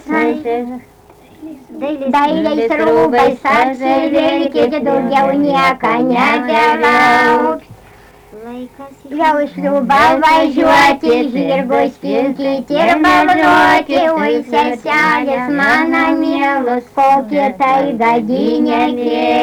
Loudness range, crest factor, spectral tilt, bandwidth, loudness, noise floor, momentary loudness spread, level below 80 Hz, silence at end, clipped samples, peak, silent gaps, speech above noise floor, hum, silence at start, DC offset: 3 LU; 10 dB; -5 dB/octave; 20 kHz; -12 LUFS; -41 dBFS; 8 LU; -46 dBFS; 0 s; under 0.1%; -4 dBFS; none; 28 dB; none; 0.05 s; under 0.1%